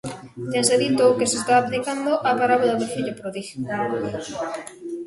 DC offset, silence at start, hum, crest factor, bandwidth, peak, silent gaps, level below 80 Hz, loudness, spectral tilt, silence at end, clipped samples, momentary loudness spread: under 0.1%; 0.05 s; none; 18 dB; 11.5 kHz; -4 dBFS; none; -60 dBFS; -22 LUFS; -3.5 dB/octave; 0 s; under 0.1%; 14 LU